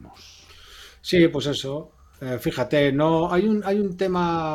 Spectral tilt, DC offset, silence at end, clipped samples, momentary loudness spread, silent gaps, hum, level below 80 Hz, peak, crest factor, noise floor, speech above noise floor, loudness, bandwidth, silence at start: -6 dB/octave; under 0.1%; 0 s; under 0.1%; 14 LU; none; none; -50 dBFS; -6 dBFS; 16 dB; -47 dBFS; 26 dB; -22 LUFS; 15.5 kHz; 0.05 s